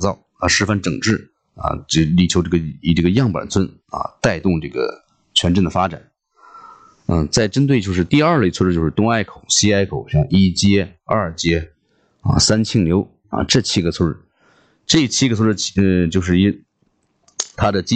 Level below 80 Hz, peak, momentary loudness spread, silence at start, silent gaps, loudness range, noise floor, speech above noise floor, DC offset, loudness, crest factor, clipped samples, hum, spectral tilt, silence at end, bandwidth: -38 dBFS; -2 dBFS; 10 LU; 0 s; none; 3 LU; -64 dBFS; 48 dB; under 0.1%; -17 LUFS; 14 dB; under 0.1%; none; -5 dB/octave; 0 s; 9.2 kHz